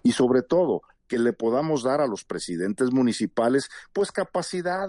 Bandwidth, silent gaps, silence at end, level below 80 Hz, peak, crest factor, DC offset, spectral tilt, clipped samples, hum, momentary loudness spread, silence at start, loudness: 11.5 kHz; none; 0 s; -64 dBFS; -10 dBFS; 14 dB; under 0.1%; -5.5 dB/octave; under 0.1%; none; 9 LU; 0.05 s; -25 LUFS